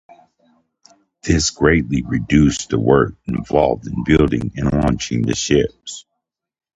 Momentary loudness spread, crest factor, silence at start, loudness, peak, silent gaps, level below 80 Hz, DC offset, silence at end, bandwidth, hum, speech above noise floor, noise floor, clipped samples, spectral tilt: 10 LU; 18 dB; 1.25 s; -17 LUFS; 0 dBFS; none; -32 dBFS; under 0.1%; 0.75 s; 8.8 kHz; none; 61 dB; -78 dBFS; under 0.1%; -5.5 dB/octave